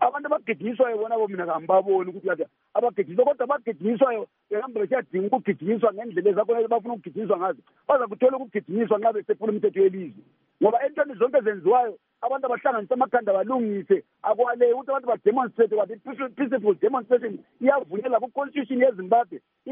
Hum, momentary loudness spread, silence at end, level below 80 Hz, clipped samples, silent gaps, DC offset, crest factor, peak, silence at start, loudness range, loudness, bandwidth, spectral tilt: none; 8 LU; 0 s; -84 dBFS; under 0.1%; none; under 0.1%; 16 dB; -6 dBFS; 0 s; 2 LU; -24 LUFS; 3.7 kHz; -5.5 dB/octave